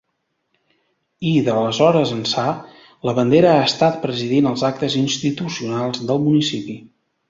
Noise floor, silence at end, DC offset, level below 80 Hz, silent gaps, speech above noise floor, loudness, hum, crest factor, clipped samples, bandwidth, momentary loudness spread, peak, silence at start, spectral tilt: -72 dBFS; 0.5 s; under 0.1%; -58 dBFS; none; 55 dB; -18 LUFS; none; 18 dB; under 0.1%; 7.8 kHz; 11 LU; -2 dBFS; 1.2 s; -5.5 dB/octave